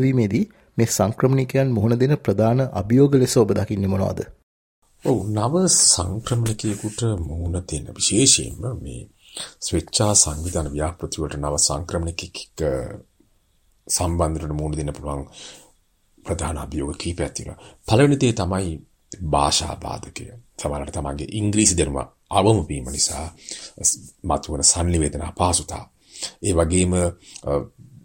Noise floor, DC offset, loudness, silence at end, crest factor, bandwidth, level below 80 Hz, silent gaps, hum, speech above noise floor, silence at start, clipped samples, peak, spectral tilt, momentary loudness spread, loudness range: -62 dBFS; under 0.1%; -21 LUFS; 0.25 s; 22 dB; 16.5 kHz; -40 dBFS; 4.43-4.82 s; none; 40 dB; 0 s; under 0.1%; 0 dBFS; -4.5 dB/octave; 17 LU; 7 LU